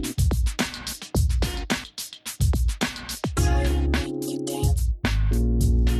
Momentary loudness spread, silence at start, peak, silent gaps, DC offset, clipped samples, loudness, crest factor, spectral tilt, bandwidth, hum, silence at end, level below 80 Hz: 6 LU; 0 s; -10 dBFS; none; under 0.1%; under 0.1%; -25 LUFS; 14 dB; -5 dB/octave; 14.5 kHz; none; 0 s; -24 dBFS